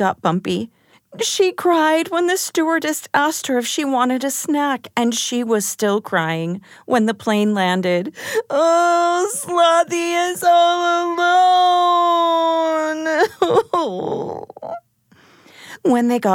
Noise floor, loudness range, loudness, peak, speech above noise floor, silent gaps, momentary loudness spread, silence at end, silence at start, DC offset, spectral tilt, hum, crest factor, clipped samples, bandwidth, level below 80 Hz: -53 dBFS; 4 LU; -17 LUFS; -2 dBFS; 36 dB; none; 10 LU; 0 s; 0 s; under 0.1%; -3.5 dB/octave; none; 16 dB; under 0.1%; 17.5 kHz; -68 dBFS